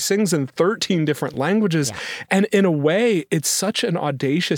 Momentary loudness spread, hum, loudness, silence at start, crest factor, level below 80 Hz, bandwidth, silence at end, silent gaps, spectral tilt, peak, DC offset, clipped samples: 5 LU; none; -20 LUFS; 0 s; 18 dB; -66 dBFS; 19 kHz; 0 s; none; -4.5 dB/octave; -2 dBFS; under 0.1%; under 0.1%